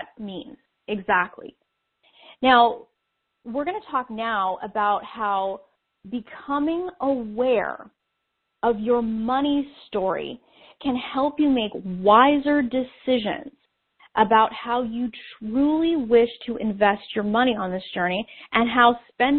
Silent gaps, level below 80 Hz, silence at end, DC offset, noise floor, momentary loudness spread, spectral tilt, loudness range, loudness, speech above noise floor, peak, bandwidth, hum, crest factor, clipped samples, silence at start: none; -56 dBFS; 0 s; under 0.1%; -77 dBFS; 14 LU; -2.5 dB/octave; 5 LU; -23 LUFS; 55 dB; -2 dBFS; 4.5 kHz; none; 20 dB; under 0.1%; 0 s